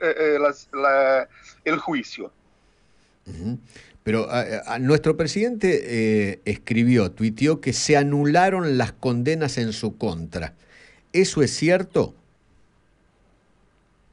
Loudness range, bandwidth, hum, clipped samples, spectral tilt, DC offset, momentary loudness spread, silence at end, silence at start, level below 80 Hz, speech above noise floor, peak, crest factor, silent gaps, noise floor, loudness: 6 LU; 11 kHz; none; under 0.1%; -5.5 dB/octave; under 0.1%; 13 LU; 2 s; 0 s; -52 dBFS; 39 dB; -4 dBFS; 18 dB; none; -61 dBFS; -22 LUFS